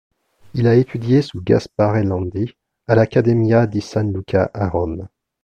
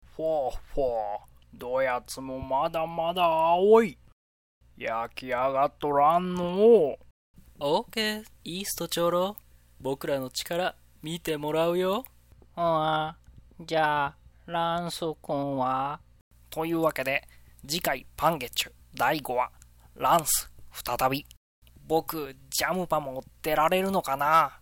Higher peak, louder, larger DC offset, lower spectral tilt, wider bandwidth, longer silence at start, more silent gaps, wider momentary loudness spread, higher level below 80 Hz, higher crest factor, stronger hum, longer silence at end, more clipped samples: first, 0 dBFS vs -8 dBFS; first, -18 LUFS vs -27 LUFS; neither; first, -8.5 dB/octave vs -4 dB/octave; second, 8.4 kHz vs 17 kHz; first, 0.55 s vs 0.15 s; second, none vs 4.12-4.61 s, 7.11-7.34 s, 16.21-16.31 s, 21.37-21.62 s; about the same, 11 LU vs 13 LU; first, -44 dBFS vs -52 dBFS; about the same, 16 dB vs 20 dB; neither; first, 0.35 s vs 0.05 s; neither